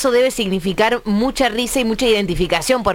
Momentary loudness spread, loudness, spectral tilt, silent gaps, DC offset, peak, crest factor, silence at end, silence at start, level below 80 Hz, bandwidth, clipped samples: 3 LU; -17 LUFS; -4 dB/octave; none; under 0.1%; -2 dBFS; 16 dB; 0 s; 0 s; -34 dBFS; 17 kHz; under 0.1%